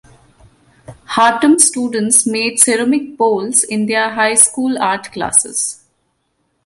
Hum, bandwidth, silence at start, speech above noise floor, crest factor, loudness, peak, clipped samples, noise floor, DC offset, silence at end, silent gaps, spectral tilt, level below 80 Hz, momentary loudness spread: none; 16 kHz; 0.9 s; 51 dB; 16 dB; -13 LUFS; 0 dBFS; under 0.1%; -65 dBFS; under 0.1%; 0.9 s; none; -2 dB/octave; -56 dBFS; 9 LU